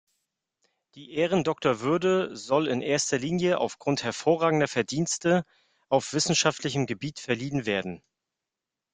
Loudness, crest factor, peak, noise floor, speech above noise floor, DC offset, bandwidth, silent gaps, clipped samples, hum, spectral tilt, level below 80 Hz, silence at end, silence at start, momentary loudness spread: -26 LUFS; 22 dB; -6 dBFS; -88 dBFS; 62 dB; under 0.1%; 9.6 kHz; none; under 0.1%; none; -4 dB/octave; -64 dBFS; 0.95 s; 0.95 s; 7 LU